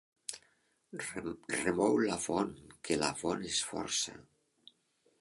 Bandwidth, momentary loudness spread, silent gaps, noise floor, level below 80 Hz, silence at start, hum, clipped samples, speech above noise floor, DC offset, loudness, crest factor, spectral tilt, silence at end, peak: 11.5 kHz; 15 LU; none; -74 dBFS; -66 dBFS; 0.3 s; none; under 0.1%; 39 dB; under 0.1%; -35 LUFS; 22 dB; -3 dB/octave; 1 s; -14 dBFS